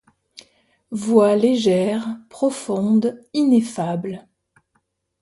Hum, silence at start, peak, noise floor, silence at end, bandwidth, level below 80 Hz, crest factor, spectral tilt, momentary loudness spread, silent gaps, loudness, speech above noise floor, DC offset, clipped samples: none; 0.9 s; -2 dBFS; -69 dBFS; 1 s; 11.5 kHz; -64 dBFS; 18 dB; -6.5 dB/octave; 14 LU; none; -19 LUFS; 50 dB; under 0.1%; under 0.1%